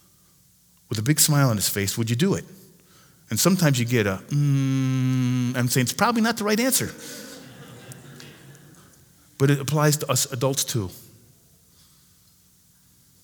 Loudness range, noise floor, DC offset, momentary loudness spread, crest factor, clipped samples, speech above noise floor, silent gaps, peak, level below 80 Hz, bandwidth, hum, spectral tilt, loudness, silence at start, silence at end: 6 LU; -58 dBFS; under 0.1%; 23 LU; 22 dB; under 0.1%; 36 dB; none; -2 dBFS; -62 dBFS; over 20 kHz; 60 Hz at -50 dBFS; -4.5 dB/octave; -22 LUFS; 0.9 s; 2.25 s